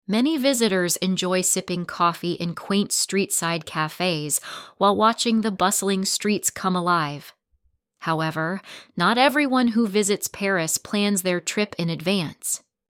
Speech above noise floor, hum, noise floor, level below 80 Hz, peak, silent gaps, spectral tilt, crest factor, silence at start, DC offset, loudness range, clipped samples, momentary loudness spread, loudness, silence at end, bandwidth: 44 dB; none; -67 dBFS; -64 dBFS; -4 dBFS; none; -3.5 dB/octave; 18 dB; 0.1 s; under 0.1%; 2 LU; under 0.1%; 8 LU; -22 LUFS; 0.3 s; 17 kHz